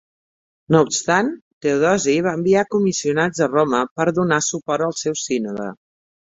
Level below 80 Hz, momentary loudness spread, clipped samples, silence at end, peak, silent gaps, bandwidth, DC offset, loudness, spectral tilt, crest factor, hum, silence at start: -58 dBFS; 7 LU; under 0.1%; 0.65 s; -2 dBFS; 1.42-1.61 s, 3.91-3.96 s; 8.2 kHz; under 0.1%; -19 LUFS; -4.5 dB/octave; 18 dB; none; 0.7 s